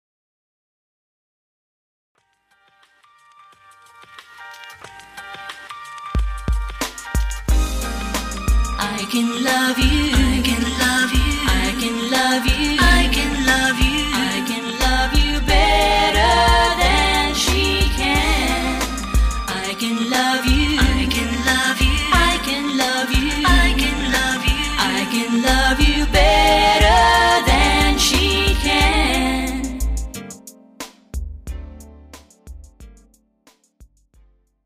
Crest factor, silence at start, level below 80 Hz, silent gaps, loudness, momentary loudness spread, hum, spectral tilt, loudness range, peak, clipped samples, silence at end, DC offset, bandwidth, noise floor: 16 dB; 4.35 s; -24 dBFS; none; -17 LUFS; 18 LU; none; -3.5 dB/octave; 15 LU; -2 dBFS; under 0.1%; 0.8 s; under 0.1%; 15.5 kHz; -62 dBFS